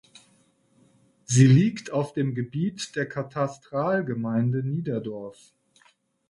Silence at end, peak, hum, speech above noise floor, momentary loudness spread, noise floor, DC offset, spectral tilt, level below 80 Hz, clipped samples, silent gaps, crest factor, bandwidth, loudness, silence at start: 0.95 s; -6 dBFS; none; 39 dB; 13 LU; -63 dBFS; under 0.1%; -6.5 dB/octave; -64 dBFS; under 0.1%; none; 20 dB; 11.5 kHz; -25 LUFS; 1.3 s